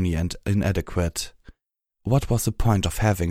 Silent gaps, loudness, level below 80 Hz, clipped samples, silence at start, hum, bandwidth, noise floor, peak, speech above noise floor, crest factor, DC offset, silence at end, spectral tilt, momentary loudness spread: none; -24 LUFS; -34 dBFS; under 0.1%; 0 s; none; 16 kHz; -78 dBFS; -4 dBFS; 55 dB; 18 dB; under 0.1%; 0 s; -6 dB/octave; 8 LU